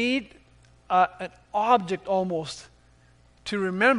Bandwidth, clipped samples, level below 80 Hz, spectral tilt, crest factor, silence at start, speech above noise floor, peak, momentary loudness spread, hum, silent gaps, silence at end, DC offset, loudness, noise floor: 10.5 kHz; under 0.1%; -60 dBFS; -5 dB/octave; 20 dB; 0 s; 33 dB; -6 dBFS; 16 LU; none; none; 0 s; under 0.1%; -25 LUFS; -57 dBFS